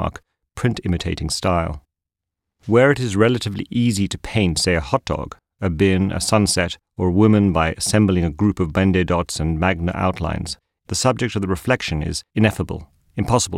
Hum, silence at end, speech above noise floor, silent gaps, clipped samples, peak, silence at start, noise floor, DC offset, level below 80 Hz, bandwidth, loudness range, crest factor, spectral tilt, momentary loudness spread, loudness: none; 0 s; 65 dB; none; under 0.1%; -4 dBFS; 0 s; -84 dBFS; under 0.1%; -36 dBFS; 15.5 kHz; 4 LU; 16 dB; -5 dB/octave; 11 LU; -20 LUFS